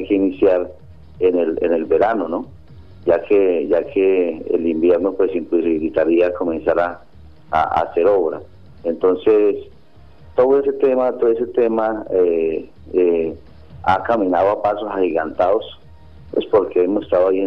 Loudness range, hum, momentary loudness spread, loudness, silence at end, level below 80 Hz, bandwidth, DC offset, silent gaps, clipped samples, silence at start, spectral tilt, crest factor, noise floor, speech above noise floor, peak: 2 LU; none; 9 LU; -18 LUFS; 0 s; -48 dBFS; 5.6 kHz; 0.6%; none; under 0.1%; 0 s; -8.5 dB/octave; 16 dB; -47 dBFS; 30 dB; -2 dBFS